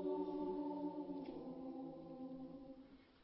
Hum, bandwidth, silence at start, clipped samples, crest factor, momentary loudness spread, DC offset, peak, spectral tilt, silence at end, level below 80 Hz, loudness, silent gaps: none; 5.6 kHz; 0 s; under 0.1%; 14 dB; 14 LU; under 0.1%; -32 dBFS; -7.5 dB/octave; 0 s; -76 dBFS; -48 LUFS; none